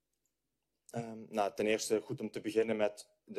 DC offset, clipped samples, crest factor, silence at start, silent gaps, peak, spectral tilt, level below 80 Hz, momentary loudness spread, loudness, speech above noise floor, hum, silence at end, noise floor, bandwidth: under 0.1%; under 0.1%; 18 dB; 0.95 s; none; -18 dBFS; -4.5 dB/octave; -76 dBFS; 12 LU; -36 LUFS; 52 dB; none; 0 s; -87 dBFS; 13.5 kHz